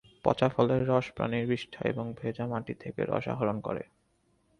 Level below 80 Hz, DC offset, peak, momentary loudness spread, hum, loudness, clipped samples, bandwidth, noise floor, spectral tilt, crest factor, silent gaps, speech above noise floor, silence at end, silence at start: -60 dBFS; under 0.1%; -8 dBFS; 10 LU; none; -31 LUFS; under 0.1%; 10 kHz; -71 dBFS; -8 dB/octave; 24 dB; none; 41 dB; 0.75 s; 0.25 s